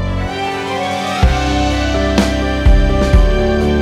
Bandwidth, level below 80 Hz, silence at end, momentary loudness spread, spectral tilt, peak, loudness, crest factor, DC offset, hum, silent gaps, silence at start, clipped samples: 12.5 kHz; -16 dBFS; 0 s; 6 LU; -6 dB/octave; 0 dBFS; -15 LUFS; 12 dB; under 0.1%; none; none; 0 s; under 0.1%